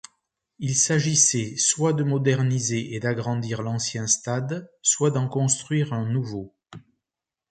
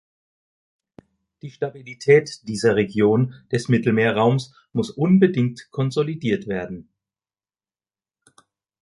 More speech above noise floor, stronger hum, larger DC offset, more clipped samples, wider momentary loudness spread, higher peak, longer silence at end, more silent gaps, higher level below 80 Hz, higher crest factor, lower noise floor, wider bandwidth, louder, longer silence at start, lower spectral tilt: second, 65 dB vs over 70 dB; neither; neither; neither; second, 9 LU vs 13 LU; about the same, -6 dBFS vs -4 dBFS; second, 0.7 s vs 2 s; neither; about the same, -62 dBFS vs -58 dBFS; about the same, 20 dB vs 20 dB; about the same, -88 dBFS vs under -90 dBFS; second, 9.6 kHz vs 11.5 kHz; about the same, -23 LUFS vs -21 LUFS; second, 0.6 s vs 1.45 s; second, -4 dB/octave vs -7 dB/octave